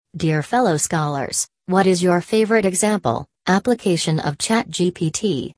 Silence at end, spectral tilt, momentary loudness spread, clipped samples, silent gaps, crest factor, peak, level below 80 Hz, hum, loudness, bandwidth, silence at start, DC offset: 0.05 s; -4.5 dB/octave; 5 LU; under 0.1%; none; 16 dB; -2 dBFS; -54 dBFS; none; -19 LUFS; 11 kHz; 0.15 s; under 0.1%